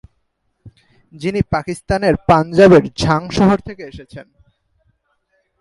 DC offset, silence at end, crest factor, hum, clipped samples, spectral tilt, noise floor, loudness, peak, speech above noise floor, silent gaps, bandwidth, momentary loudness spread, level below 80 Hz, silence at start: under 0.1%; 1.4 s; 16 dB; none; under 0.1%; -6.5 dB/octave; -67 dBFS; -14 LUFS; 0 dBFS; 53 dB; none; 11.5 kHz; 23 LU; -38 dBFS; 0.65 s